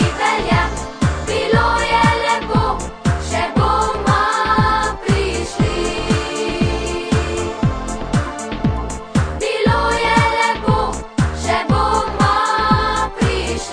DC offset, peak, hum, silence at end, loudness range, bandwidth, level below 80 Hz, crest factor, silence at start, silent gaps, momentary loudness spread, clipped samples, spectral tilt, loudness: under 0.1%; 0 dBFS; none; 0 s; 4 LU; 10 kHz; -28 dBFS; 16 dB; 0 s; none; 6 LU; under 0.1%; -5 dB/octave; -17 LUFS